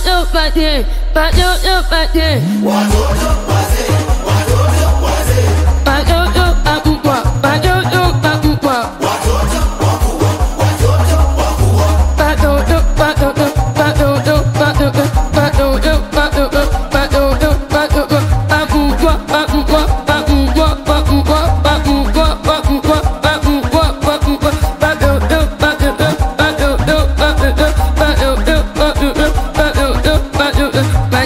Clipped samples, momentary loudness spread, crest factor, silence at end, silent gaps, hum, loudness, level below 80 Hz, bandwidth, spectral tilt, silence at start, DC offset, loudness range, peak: under 0.1%; 2 LU; 12 dB; 0 s; none; none; -13 LUFS; -16 dBFS; 16.5 kHz; -5.5 dB/octave; 0 s; under 0.1%; 1 LU; 0 dBFS